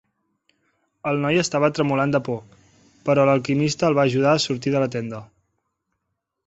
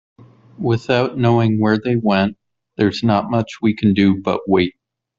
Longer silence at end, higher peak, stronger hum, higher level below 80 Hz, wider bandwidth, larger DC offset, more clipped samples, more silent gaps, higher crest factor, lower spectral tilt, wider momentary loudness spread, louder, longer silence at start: first, 1.2 s vs 0.5 s; about the same, -4 dBFS vs -2 dBFS; neither; second, -60 dBFS vs -52 dBFS; first, 8.2 kHz vs 7.4 kHz; neither; neither; neither; about the same, 18 dB vs 16 dB; second, -5.5 dB/octave vs -7.5 dB/octave; first, 12 LU vs 6 LU; second, -21 LUFS vs -17 LUFS; first, 1.05 s vs 0.6 s